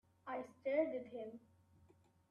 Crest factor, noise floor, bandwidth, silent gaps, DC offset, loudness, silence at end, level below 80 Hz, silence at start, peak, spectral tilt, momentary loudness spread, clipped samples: 20 dB; -71 dBFS; 7.2 kHz; none; under 0.1%; -43 LUFS; 0.95 s; -86 dBFS; 0.25 s; -24 dBFS; -7 dB/octave; 14 LU; under 0.1%